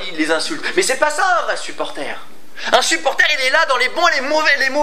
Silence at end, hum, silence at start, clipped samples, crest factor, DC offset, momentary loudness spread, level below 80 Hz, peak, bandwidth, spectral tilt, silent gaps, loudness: 0 s; none; 0 s; under 0.1%; 18 dB; 5%; 12 LU; -64 dBFS; 0 dBFS; 16 kHz; -0.5 dB/octave; none; -16 LUFS